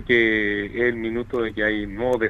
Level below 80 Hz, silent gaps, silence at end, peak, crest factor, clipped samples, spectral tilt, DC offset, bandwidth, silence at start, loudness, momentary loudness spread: -44 dBFS; none; 0 s; -6 dBFS; 16 dB; under 0.1%; -6.5 dB/octave; under 0.1%; 8.2 kHz; 0 s; -22 LUFS; 8 LU